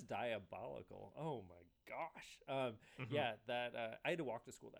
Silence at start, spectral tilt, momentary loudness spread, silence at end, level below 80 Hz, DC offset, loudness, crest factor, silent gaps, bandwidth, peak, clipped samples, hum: 0 s; -5.5 dB/octave; 12 LU; 0 s; -80 dBFS; under 0.1%; -46 LUFS; 20 dB; none; over 20 kHz; -28 dBFS; under 0.1%; none